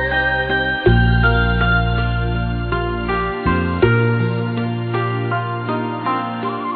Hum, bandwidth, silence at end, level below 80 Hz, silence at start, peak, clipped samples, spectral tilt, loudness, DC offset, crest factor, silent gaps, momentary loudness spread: none; 4.6 kHz; 0 s; -26 dBFS; 0 s; -2 dBFS; under 0.1%; -10.5 dB/octave; -18 LUFS; under 0.1%; 16 dB; none; 7 LU